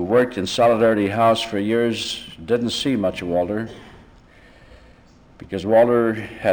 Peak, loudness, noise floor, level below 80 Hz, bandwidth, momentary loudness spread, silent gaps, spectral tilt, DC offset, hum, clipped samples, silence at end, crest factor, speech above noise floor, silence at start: -6 dBFS; -20 LUFS; -49 dBFS; -52 dBFS; over 20 kHz; 12 LU; none; -5.5 dB/octave; under 0.1%; none; under 0.1%; 0 s; 14 dB; 30 dB; 0 s